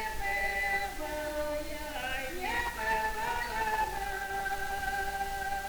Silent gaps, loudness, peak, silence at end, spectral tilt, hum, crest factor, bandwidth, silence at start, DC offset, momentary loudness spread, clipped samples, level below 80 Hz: none; -33 LUFS; -18 dBFS; 0 s; -2.5 dB/octave; none; 14 dB; over 20 kHz; 0 s; under 0.1%; 5 LU; under 0.1%; -46 dBFS